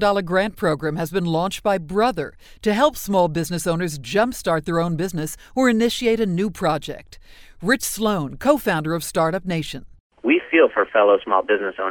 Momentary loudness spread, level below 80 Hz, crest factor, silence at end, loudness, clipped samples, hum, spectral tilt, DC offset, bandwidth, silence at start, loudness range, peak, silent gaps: 10 LU; -46 dBFS; 18 dB; 0 s; -21 LUFS; under 0.1%; none; -5 dB/octave; under 0.1%; over 20 kHz; 0 s; 3 LU; -2 dBFS; 10.00-10.10 s